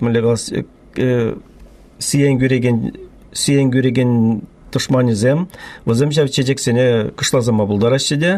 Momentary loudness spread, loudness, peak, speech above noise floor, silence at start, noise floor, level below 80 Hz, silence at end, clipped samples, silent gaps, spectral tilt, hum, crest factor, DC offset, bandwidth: 10 LU; -16 LUFS; -2 dBFS; 26 dB; 0 s; -41 dBFS; -46 dBFS; 0 s; under 0.1%; none; -5.5 dB/octave; none; 12 dB; under 0.1%; 14 kHz